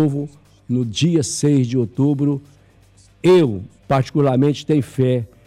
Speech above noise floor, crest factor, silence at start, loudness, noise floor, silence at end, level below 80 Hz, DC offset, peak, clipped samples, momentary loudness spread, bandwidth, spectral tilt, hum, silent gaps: 33 dB; 12 dB; 0 s; -18 LUFS; -50 dBFS; 0.2 s; -54 dBFS; under 0.1%; -6 dBFS; under 0.1%; 9 LU; 12.5 kHz; -6.5 dB/octave; none; none